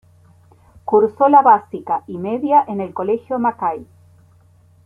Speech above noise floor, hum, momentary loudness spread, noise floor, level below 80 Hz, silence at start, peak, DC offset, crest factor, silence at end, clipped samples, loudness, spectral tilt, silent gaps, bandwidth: 35 dB; none; 13 LU; -51 dBFS; -60 dBFS; 0.85 s; -2 dBFS; under 0.1%; 16 dB; 1 s; under 0.1%; -17 LUFS; -9 dB/octave; none; 3.5 kHz